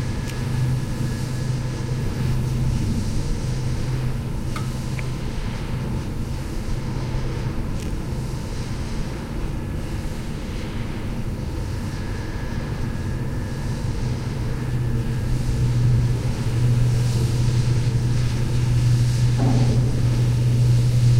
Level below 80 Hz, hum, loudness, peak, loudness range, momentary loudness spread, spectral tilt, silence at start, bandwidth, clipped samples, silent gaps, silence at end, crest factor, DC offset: -28 dBFS; none; -24 LUFS; -8 dBFS; 9 LU; 10 LU; -6.5 dB/octave; 0 s; 14 kHz; under 0.1%; none; 0 s; 14 dB; under 0.1%